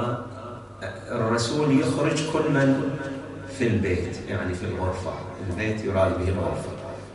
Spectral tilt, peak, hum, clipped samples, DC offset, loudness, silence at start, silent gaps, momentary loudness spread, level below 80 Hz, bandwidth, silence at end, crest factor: -6 dB/octave; -10 dBFS; none; under 0.1%; under 0.1%; -25 LUFS; 0 s; none; 14 LU; -48 dBFS; 11.5 kHz; 0 s; 16 dB